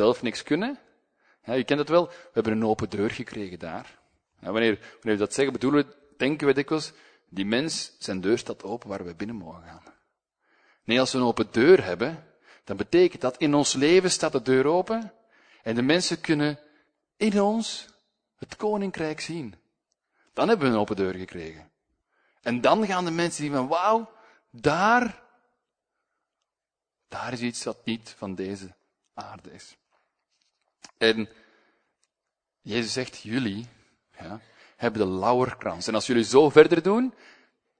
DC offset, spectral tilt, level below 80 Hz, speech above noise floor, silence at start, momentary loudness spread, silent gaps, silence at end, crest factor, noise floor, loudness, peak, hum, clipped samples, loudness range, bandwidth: under 0.1%; -4.5 dB/octave; -62 dBFS; 65 dB; 0 s; 18 LU; none; 0.7 s; 26 dB; -89 dBFS; -25 LUFS; 0 dBFS; none; under 0.1%; 11 LU; 9.6 kHz